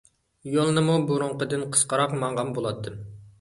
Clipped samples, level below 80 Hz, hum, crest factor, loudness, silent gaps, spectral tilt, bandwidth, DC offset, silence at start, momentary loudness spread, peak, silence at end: under 0.1%; -60 dBFS; none; 20 dB; -24 LUFS; none; -4.5 dB/octave; 11.5 kHz; under 0.1%; 0.45 s; 16 LU; -6 dBFS; 0.1 s